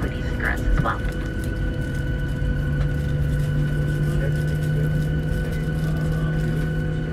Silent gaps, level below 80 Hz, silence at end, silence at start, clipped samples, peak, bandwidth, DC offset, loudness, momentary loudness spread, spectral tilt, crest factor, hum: none; -28 dBFS; 0 s; 0 s; under 0.1%; -8 dBFS; 14 kHz; under 0.1%; -24 LUFS; 4 LU; -7.5 dB/octave; 14 dB; none